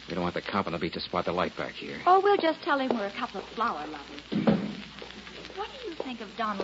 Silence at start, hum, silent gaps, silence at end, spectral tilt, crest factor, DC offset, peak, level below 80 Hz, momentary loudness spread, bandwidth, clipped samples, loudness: 0 s; none; none; 0 s; -6 dB/octave; 20 dB; under 0.1%; -10 dBFS; -60 dBFS; 17 LU; 8 kHz; under 0.1%; -29 LUFS